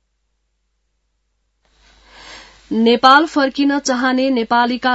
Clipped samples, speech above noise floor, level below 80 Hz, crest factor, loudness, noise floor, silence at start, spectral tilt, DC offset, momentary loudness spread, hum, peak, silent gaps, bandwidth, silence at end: under 0.1%; 54 dB; -56 dBFS; 18 dB; -14 LUFS; -68 dBFS; 2.25 s; -3 dB/octave; under 0.1%; 7 LU; none; 0 dBFS; none; 8 kHz; 0 s